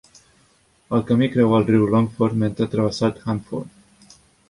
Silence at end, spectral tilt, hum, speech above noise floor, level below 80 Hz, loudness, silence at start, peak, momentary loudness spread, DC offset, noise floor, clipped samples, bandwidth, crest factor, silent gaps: 0.8 s; -7.5 dB/octave; none; 40 dB; -52 dBFS; -20 LUFS; 0.9 s; -4 dBFS; 10 LU; under 0.1%; -59 dBFS; under 0.1%; 11.5 kHz; 16 dB; none